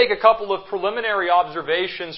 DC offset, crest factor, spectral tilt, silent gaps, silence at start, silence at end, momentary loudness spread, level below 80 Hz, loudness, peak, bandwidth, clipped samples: under 0.1%; 18 dB; -8 dB/octave; none; 0 s; 0 s; 7 LU; -58 dBFS; -20 LUFS; -2 dBFS; 5.8 kHz; under 0.1%